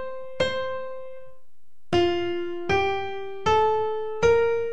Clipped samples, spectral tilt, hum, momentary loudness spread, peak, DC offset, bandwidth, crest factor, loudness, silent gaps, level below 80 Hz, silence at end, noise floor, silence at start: under 0.1%; -5 dB/octave; none; 14 LU; -10 dBFS; 2%; 9 kHz; 16 dB; -25 LUFS; none; -50 dBFS; 0 s; -70 dBFS; 0 s